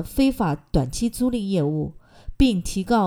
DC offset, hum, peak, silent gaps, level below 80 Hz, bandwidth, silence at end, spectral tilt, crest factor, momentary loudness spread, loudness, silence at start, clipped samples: under 0.1%; none; -6 dBFS; none; -34 dBFS; 18 kHz; 0 s; -6 dB/octave; 16 dB; 5 LU; -23 LUFS; 0 s; under 0.1%